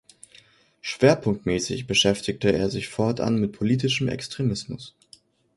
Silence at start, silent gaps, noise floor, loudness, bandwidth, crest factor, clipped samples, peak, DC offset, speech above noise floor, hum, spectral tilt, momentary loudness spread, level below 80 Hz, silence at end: 0.85 s; none; -56 dBFS; -24 LUFS; 11.5 kHz; 22 dB; under 0.1%; -4 dBFS; under 0.1%; 32 dB; none; -5 dB/octave; 13 LU; -50 dBFS; 0.7 s